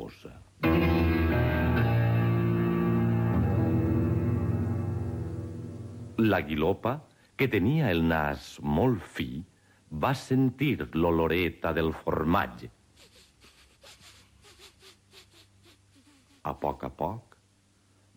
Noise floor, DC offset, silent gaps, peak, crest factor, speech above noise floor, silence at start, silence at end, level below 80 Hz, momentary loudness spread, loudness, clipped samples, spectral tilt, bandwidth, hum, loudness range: -65 dBFS; under 0.1%; none; -12 dBFS; 16 dB; 37 dB; 0 s; 0.95 s; -44 dBFS; 13 LU; -28 LUFS; under 0.1%; -8 dB/octave; 17 kHz; none; 13 LU